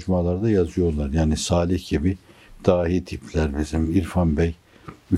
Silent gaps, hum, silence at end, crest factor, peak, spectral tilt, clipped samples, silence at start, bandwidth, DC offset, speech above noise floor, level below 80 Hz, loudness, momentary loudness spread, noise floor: none; none; 0 s; 20 dB; -2 dBFS; -6.5 dB/octave; under 0.1%; 0 s; 12.5 kHz; under 0.1%; 23 dB; -36 dBFS; -23 LUFS; 5 LU; -44 dBFS